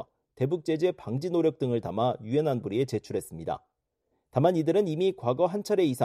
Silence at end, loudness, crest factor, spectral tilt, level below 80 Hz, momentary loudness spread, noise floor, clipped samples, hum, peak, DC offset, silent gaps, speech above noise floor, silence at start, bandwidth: 0 s; -28 LUFS; 18 dB; -7.5 dB/octave; -64 dBFS; 10 LU; -78 dBFS; under 0.1%; none; -10 dBFS; under 0.1%; none; 51 dB; 0 s; 14.5 kHz